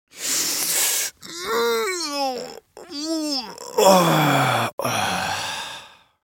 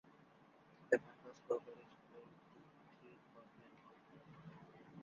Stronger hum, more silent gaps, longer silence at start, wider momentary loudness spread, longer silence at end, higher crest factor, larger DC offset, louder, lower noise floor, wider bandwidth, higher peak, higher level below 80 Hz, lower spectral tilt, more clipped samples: neither; first, 4.73-4.78 s vs none; about the same, 0.15 s vs 0.05 s; second, 15 LU vs 27 LU; first, 0.35 s vs 0 s; second, 22 dB vs 30 dB; neither; first, -21 LUFS vs -41 LUFS; second, -43 dBFS vs -67 dBFS; first, 17 kHz vs 7 kHz; first, 0 dBFS vs -18 dBFS; first, -64 dBFS vs -88 dBFS; second, -3 dB/octave vs -5 dB/octave; neither